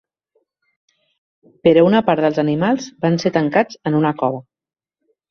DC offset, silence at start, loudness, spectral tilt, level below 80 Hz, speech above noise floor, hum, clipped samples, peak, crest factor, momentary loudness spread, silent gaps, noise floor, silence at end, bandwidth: under 0.1%; 1.65 s; -17 LUFS; -7 dB/octave; -58 dBFS; 53 dB; none; under 0.1%; -2 dBFS; 18 dB; 7 LU; none; -69 dBFS; 0.9 s; 6.8 kHz